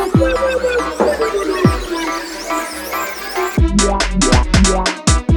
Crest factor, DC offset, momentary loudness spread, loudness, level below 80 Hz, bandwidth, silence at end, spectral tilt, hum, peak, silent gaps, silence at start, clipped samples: 16 dB; under 0.1%; 8 LU; -16 LUFS; -22 dBFS; over 20 kHz; 0 s; -4.5 dB/octave; none; 0 dBFS; none; 0 s; under 0.1%